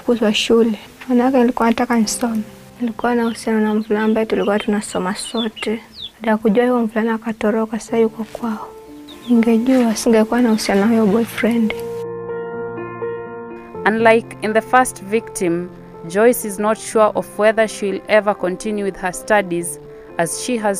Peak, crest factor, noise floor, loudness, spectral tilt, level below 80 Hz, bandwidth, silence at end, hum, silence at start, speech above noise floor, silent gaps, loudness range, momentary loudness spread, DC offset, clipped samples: 0 dBFS; 18 dB; -37 dBFS; -18 LUFS; -4.5 dB/octave; -50 dBFS; 15.5 kHz; 0 s; none; 0.05 s; 20 dB; none; 3 LU; 12 LU; under 0.1%; under 0.1%